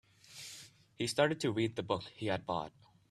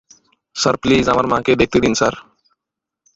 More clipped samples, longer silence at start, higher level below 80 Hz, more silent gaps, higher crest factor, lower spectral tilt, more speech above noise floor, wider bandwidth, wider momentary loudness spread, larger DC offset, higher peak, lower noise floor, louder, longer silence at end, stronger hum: neither; second, 0.3 s vs 0.55 s; second, -70 dBFS vs -42 dBFS; neither; first, 22 dB vs 16 dB; about the same, -5 dB/octave vs -4.5 dB/octave; second, 20 dB vs 68 dB; first, 15 kHz vs 8 kHz; first, 17 LU vs 7 LU; neither; second, -14 dBFS vs -2 dBFS; second, -55 dBFS vs -84 dBFS; second, -35 LUFS vs -16 LUFS; second, 0.4 s vs 0.95 s; neither